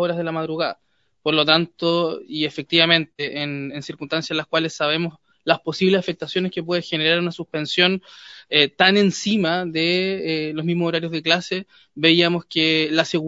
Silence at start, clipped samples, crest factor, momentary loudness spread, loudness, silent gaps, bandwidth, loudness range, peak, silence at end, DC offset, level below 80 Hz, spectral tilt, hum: 0 s; under 0.1%; 22 dB; 12 LU; -20 LUFS; none; 7.8 kHz; 3 LU; 0 dBFS; 0 s; under 0.1%; -64 dBFS; -4.5 dB/octave; none